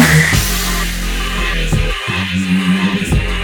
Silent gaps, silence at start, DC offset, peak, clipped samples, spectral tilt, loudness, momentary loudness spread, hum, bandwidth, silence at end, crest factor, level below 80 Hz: none; 0 s; under 0.1%; 0 dBFS; under 0.1%; -4 dB/octave; -15 LUFS; 7 LU; none; 19.5 kHz; 0 s; 14 dB; -20 dBFS